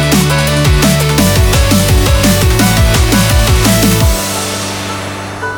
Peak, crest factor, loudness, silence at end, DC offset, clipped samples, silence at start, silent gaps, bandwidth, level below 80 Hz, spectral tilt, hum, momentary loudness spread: 0 dBFS; 10 dB; -10 LUFS; 0 s; under 0.1%; under 0.1%; 0 s; none; over 20 kHz; -16 dBFS; -4.5 dB/octave; none; 8 LU